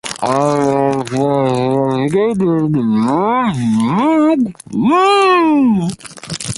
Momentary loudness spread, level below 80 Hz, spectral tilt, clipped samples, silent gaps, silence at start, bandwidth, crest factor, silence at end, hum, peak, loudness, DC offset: 7 LU; -50 dBFS; -6 dB/octave; under 0.1%; none; 0.05 s; 11.5 kHz; 12 dB; 0.05 s; none; 0 dBFS; -14 LUFS; under 0.1%